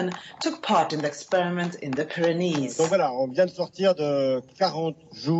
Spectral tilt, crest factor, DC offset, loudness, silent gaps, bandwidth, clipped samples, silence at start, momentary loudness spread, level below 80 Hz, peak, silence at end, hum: -5.5 dB/octave; 16 dB; under 0.1%; -25 LUFS; none; 8.4 kHz; under 0.1%; 0 s; 7 LU; -72 dBFS; -8 dBFS; 0 s; none